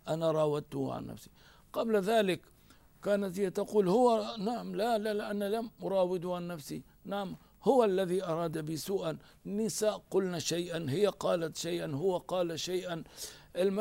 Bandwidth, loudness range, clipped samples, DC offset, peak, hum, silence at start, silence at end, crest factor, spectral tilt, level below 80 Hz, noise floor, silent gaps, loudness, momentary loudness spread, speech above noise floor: 16 kHz; 3 LU; under 0.1%; under 0.1%; -14 dBFS; none; 0.05 s; 0 s; 18 dB; -5 dB/octave; -66 dBFS; -60 dBFS; none; -33 LUFS; 13 LU; 28 dB